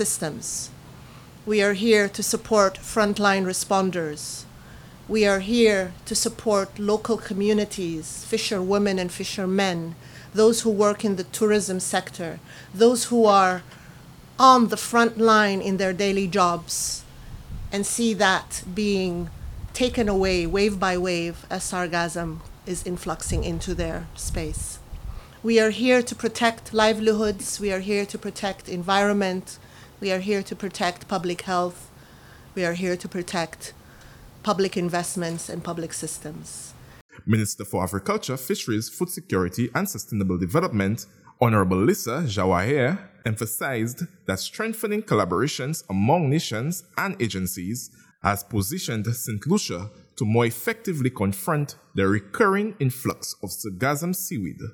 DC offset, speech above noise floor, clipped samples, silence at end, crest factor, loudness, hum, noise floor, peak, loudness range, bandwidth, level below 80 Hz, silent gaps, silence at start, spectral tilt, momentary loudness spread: under 0.1%; 24 dB; under 0.1%; 0 s; 22 dB; -24 LUFS; none; -47 dBFS; -2 dBFS; 8 LU; 19.5 kHz; -46 dBFS; 37.01-37.09 s; 0 s; -4.5 dB/octave; 13 LU